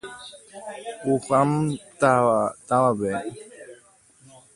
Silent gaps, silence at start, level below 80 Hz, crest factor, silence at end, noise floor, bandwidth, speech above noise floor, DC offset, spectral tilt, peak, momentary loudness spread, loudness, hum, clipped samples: none; 0.05 s; -62 dBFS; 20 dB; 0.8 s; -55 dBFS; 11.5 kHz; 33 dB; under 0.1%; -6.5 dB/octave; -4 dBFS; 21 LU; -22 LUFS; none; under 0.1%